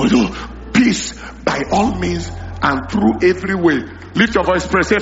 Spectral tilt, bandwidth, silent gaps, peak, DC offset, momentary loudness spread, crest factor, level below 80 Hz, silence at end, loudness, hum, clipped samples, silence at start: -4.5 dB/octave; 8 kHz; none; 0 dBFS; under 0.1%; 9 LU; 16 dB; -34 dBFS; 0 s; -16 LUFS; none; under 0.1%; 0 s